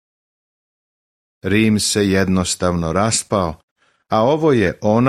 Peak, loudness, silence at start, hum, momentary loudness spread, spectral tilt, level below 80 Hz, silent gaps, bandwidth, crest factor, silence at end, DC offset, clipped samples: -2 dBFS; -17 LUFS; 1.45 s; none; 6 LU; -4.5 dB/octave; -44 dBFS; 3.63-3.76 s; 15.5 kHz; 16 dB; 0 s; under 0.1%; under 0.1%